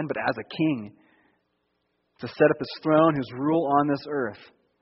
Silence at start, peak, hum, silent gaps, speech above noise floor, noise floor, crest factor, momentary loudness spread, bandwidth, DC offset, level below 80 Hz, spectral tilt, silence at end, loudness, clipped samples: 0 s; -6 dBFS; none; none; 50 dB; -74 dBFS; 20 dB; 13 LU; 5.8 kHz; under 0.1%; -64 dBFS; -5.5 dB/octave; 0.4 s; -24 LUFS; under 0.1%